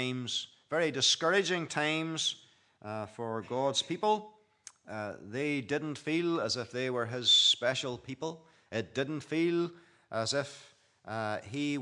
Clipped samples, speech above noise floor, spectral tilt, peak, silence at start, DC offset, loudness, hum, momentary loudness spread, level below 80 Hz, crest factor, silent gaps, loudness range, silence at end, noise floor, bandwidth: under 0.1%; 25 dB; -3 dB/octave; -14 dBFS; 0 s; under 0.1%; -31 LUFS; none; 15 LU; -80 dBFS; 18 dB; none; 6 LU; 0 s; -57 dBFS; 11 kHz